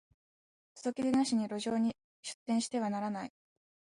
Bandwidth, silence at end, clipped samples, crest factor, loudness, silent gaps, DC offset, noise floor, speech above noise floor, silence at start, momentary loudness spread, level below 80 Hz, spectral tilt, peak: 11.5 kHz; 0.65 s; under 0.1%; 16 dB; -34 LUFS; 2.04-2.23 s, 2.34-2.46 s; under 0.1%; under -90 dBFS; over 57 dB; 0.75 s; 13 LU; -76 dBFS; -4.5 dB/octave; -20 dBFS